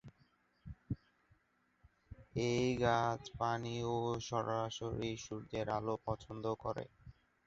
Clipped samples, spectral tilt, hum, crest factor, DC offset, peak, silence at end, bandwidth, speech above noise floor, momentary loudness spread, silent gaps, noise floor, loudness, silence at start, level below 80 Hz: under 0.1%; -5 dB/octave; none; 22 dB; under 0.1%; -18 dBFS; 0.35 s; 8 kHz; 39 dB; 13 LU; none; -77 dBFS; -39 LUFS; 0.05 s; -62 dBFS